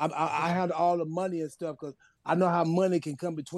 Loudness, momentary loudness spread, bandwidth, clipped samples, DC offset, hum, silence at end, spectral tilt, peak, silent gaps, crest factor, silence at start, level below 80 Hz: -29 LUFS; 12 LU; 12.5 kHz; under 0.1%; under 0.1%; none; 0 s; -7 dB/octave; -14 dBFS; none; 16 dB; 0 s; -74 dBFS